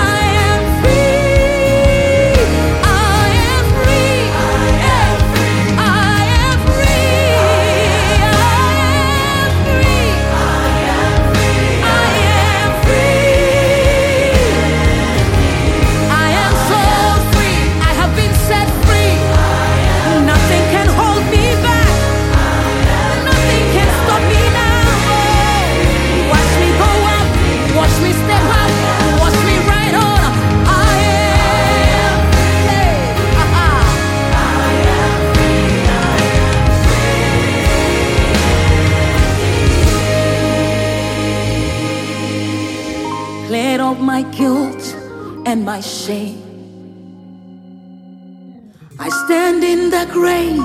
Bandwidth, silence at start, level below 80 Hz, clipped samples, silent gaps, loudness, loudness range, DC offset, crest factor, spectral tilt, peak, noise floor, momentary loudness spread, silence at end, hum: 16.5 kHz; 0 s; -18 dBFS; under 0.1%; none; -12 LUFS; 6 LU; under 0.1%; 12 dB; -5 dB/octave; 0 dBFS; -38 dBFS; 6 LU; 0 s; none